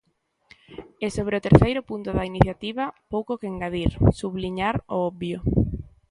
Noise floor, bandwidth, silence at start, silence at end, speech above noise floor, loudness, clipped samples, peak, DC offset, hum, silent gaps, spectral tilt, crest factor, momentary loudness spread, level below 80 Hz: -59 dBFS; 11.5 kHz; 0.7 s; 0.25 s; 37 dB; -24 LUFS; under 0.1%; 0 dBFS; under 0.1%; none; none; -7.5 dB/octave; 24 dB; 13 LU; -36 dBFS